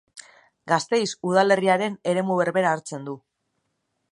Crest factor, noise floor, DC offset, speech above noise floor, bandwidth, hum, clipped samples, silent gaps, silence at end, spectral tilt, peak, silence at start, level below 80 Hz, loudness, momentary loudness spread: 20 dB; -75 dBFS; under 0.1%; 53 dB; 11 kHz; none; under 0.1%; none; 0.95 s; -5 dB/octave; -4 dBFS; 0.15 s; -74 dBFS; -22 LUFS; 15 LU